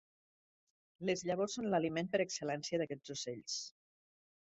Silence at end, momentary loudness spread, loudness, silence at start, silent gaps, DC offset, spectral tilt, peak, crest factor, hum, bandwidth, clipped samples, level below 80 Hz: 0.8 s; 7 LU; -38 LUFS; 1 s; none; under 0.1%; -4 dB/octave; -20 dBFS; 20 dB; none; 8 kHz; under 0.1%; -78 dBFS